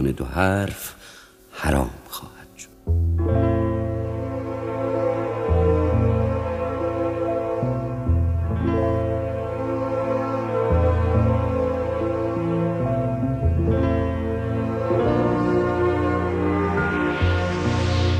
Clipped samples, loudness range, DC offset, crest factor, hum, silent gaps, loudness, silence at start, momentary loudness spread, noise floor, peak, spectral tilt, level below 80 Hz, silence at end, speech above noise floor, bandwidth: under 0.1%; 3 LU; under 0.1%; 16 dB; none; none; -23 LUFS; 0 s; 8 LU; -44 dBFS; -6 dBFS; -7.5 dB/octave; -32 dBFS; 0 s; 20 dB; 15 kHz